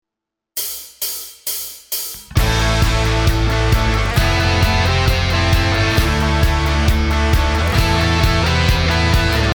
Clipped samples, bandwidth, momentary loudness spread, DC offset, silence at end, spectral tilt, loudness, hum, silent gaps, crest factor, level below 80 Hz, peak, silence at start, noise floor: under 0.1%; over 20 kHz; 8 LU; under 0.1%; 0 s; -4.5 dB/octave; -16 LUFS; none; none; 12 dB; -20 dBFS; -2 dBFS; 0.55 s; -83 dBFS